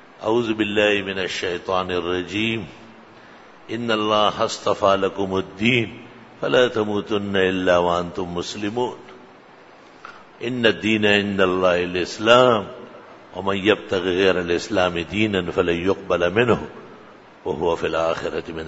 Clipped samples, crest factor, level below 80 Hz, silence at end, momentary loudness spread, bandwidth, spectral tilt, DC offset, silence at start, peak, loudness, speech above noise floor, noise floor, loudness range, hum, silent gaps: under 0.1%; 20 dB; -54 dBFS; 0 s; 12 LU; 8 kHz; -5 dB/octave; under 0.1%; 0.2 s; 0 dBFS; -21 LUFS; 26 dB; -47 dBFS; 5 LU; none; none